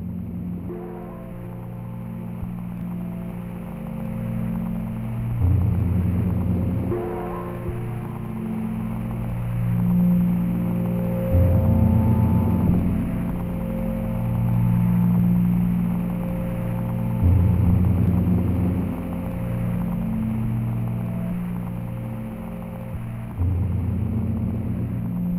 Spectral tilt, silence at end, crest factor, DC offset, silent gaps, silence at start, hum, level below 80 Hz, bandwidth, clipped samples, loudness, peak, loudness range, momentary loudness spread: -10 dB/octave; 0 s; 16 dB; under 0.1%; none; 0 s; none; -36 dBFS; 14.5 kHz; under 0.1%; -24 LUFS; -6 dBFS; 9 LU; 13 LU